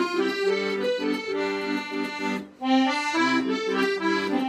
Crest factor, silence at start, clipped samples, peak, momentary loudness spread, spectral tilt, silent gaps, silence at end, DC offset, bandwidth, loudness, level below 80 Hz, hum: 14 dB; 0 s; under 0.1%; -10 dBFS; 6 LU; -4 dB/octave; none; 0 s; under 0.1%; 14.5 kHz; -25 LUFS; -70 dBFS; none